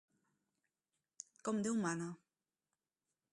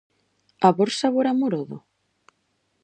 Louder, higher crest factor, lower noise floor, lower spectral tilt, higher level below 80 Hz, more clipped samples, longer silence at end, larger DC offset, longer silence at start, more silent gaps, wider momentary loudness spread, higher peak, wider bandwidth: second, -40 LUFS vs -22 LUFS; about the same, 20 dB vs 22 dB; first, under -90 dBFS vs -71 dBFS; about the same, -5 dB/octave vs -5.5 dB/octave; second, -86 dBFS vs -74 dBFS; neither; about the same, 1.15 s vs 1.05 s; neither; first, 1.45 s vs 0.6 s; neither; first, 18 LU vs 15 LU; second, -26 dBFS vs -2 dBFS; first, 11.5 kHz vs 9.4 kHz